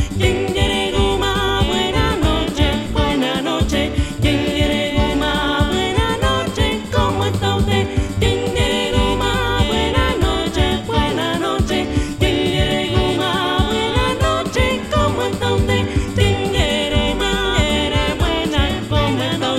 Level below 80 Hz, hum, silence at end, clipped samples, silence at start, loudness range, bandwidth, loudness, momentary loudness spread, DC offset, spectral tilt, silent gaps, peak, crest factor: -24 dBFS; none; 0 s; under 0.1%; 0 s; 1 LU; 15.5 kHz; -17 LUFS; 2 LU; under 0.1%; -5 dB/octave; none; 0 dBFS; 16 dB